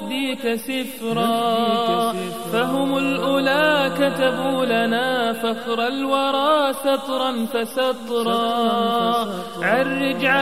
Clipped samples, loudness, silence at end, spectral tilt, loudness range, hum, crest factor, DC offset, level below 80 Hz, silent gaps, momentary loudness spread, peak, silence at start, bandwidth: under 0.1%; -20 LUFS; 0 s; -4.5 dB/octave; 2 LU; none; 16 dB; 0.5%; -64 dBFS; none; 6 LU; -4 dBFS; 0 s; 16 kHz